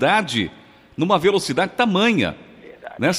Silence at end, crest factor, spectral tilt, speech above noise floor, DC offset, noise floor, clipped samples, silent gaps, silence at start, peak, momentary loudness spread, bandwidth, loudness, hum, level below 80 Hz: 0 s; 18 dB; -4.5 dB/octave; 21 dB; under 0.1%; -39 dBFS; under 0.1%; none; 0 s; -2 dBFS; 21 LU; 15.5 kHz; -19 LUFS; none; -56 dBFS